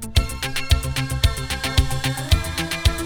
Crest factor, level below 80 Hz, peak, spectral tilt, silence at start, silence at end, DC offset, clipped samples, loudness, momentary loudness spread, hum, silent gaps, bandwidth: 18 dB; -24 dBFS; -4 dBFS; -4 dB/octave; 0 s; 0 s; under 0.1%; under 0.1%; -22 LUFS; 4 LU; none; none; over 20 kHz